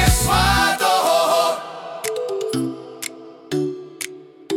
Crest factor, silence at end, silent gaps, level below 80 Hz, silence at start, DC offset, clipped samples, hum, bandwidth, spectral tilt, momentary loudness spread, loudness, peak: 16 dB; 0 s; none; -32 dBFS; 0 s; under 0.1%; under 0.1%; none; 18 kHz; -3.5 dB/octave; 15 LU; -19 LUFS; -4 dBFS